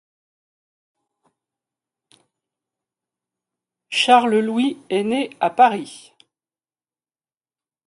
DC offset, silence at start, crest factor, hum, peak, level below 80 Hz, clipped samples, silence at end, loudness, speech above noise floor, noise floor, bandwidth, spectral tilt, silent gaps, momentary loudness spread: under 0.1%; 3.9 s; 22 dB; none; -2 dBFS; -74 dBFS; under 0.1%; 1.9 s; -18 LUFS; over 72 dB; under -90 dBFS; 11.5 kHz; -4 dB/octave; none; 10 LU